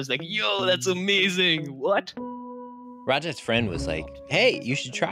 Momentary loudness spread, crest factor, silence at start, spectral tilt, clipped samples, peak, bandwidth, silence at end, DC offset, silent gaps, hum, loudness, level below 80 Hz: 16 LU; 18 dB; 0 s; -4 dB/octave; under 0.1%; -8 dBFS; 16 kHz; 0 s; under 0.1%; none; none; -24 LUFS; -48 dBFS